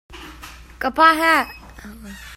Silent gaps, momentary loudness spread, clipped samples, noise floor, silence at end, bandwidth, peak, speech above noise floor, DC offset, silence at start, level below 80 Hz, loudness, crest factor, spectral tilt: none; 25 LU; under 0.1%; -40 dBFS; 0 s; 16.5 kHz; 0 dBFS; 22 dB; under 0.1%; 0.1 s; -44 dBFS; -16 LUFS; 20 dB; -3 dB/octave